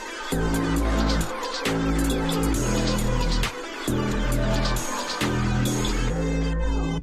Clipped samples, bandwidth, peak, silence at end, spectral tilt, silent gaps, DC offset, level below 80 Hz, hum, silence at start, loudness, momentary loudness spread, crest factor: under 0.1%; 15.5 kHz; -10 dBFS; 0 s; -5 dB/octave; none; under 0.1%; -28 dBFS; none; 0 s; -25 LUFS; 3 LU; 14 dB